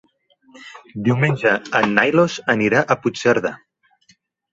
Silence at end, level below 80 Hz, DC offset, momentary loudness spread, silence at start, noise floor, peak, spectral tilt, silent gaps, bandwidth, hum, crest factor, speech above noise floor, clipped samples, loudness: 0.95 s; -58 dBFS; under 0.1%; 12 LU; 0.6 s; -59 dBFS; 0 dBFS; -6 dB/octave; none; 8 kHz; none; 20 dB; 40 dB; under 0.1%; -18 LUFS